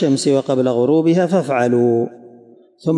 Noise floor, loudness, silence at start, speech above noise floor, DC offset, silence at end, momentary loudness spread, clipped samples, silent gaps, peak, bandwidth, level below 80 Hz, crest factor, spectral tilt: -46 dBFS; -16 LUFS; 0 s; 30 dB; under 0.1%; 0 s; 6 LU; under 0.1%; none; -4 dBFS; 11.5 kHz; -68 dBFS; 12 dB; -6.5 dB/octave